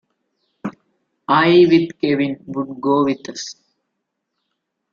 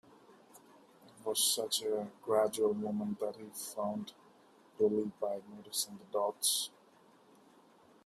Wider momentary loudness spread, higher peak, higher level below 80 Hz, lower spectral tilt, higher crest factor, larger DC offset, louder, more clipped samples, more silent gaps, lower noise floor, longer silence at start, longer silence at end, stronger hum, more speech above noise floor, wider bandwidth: first, 20 LU vs 12 LU; first, -2 dBFS vs -16 dBFS; first, -62 dBFS vs -82 dBFS; first, -6 dB/octave vs -3 dB/octave; second, 16 dB vs 22 dB; neither; first, -16 LUFS vs -35 LUFS; neither; neither; first, -76 dBFS vs -64 dBFS; first, 0.65 s vs 0.3 s; about the same, 1.4 s vs 1.35 s; neither; first, 60 dB vs 29 dB; second, 7.4 kHz vs 15.5 kHz